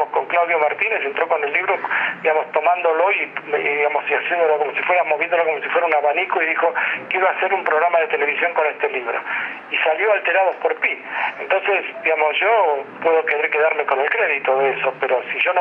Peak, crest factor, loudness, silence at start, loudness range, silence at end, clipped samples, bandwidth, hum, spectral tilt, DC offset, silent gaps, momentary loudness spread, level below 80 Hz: -2 dBFS; 18 dB; -18 LUFS; 0 s; 1 LU; 0 s; under 0.1%; 5 kHz; none; -5.5 dB/octave; under 0.1%; none; 4 LU; -80 dBFS